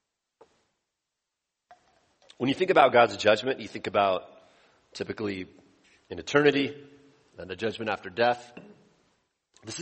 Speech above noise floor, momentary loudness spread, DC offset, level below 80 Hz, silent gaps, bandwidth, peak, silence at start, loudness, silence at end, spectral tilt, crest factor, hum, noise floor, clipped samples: 59 dB; 23 LU; under 0.1%; -68 dBFS; none; 8.4 kHz; -4 dBFS; 2.4 s; -26 LUFS; 0 s; -4.5 dB/octave; 24 dB; none; -85 dBFS; under 0.1%